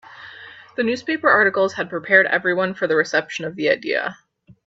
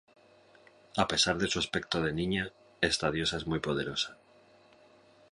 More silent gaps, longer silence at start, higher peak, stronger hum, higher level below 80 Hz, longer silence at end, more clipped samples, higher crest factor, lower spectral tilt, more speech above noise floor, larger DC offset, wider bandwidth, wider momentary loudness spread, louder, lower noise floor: neither; second, 0.1 s vs 0.95 s; first, 0 dBFS vs -12 dBFS; neither; second, -66 dBFS vs -54 dBFS; second, 0.55 s vs 1.2 s; neither; about the same, 20 dB vs 22 dB; about the same, -4.5 dB/octave vs -3.5 dB/octave; second, 22 dB vs 29 dB; neither; second, 7.8 kHz vs 11.5 kHz; first, 17 LU vs 7 LU; first, -19 LUFS vs -31 LUFS; second, -41 dBFS vs -61 dBFS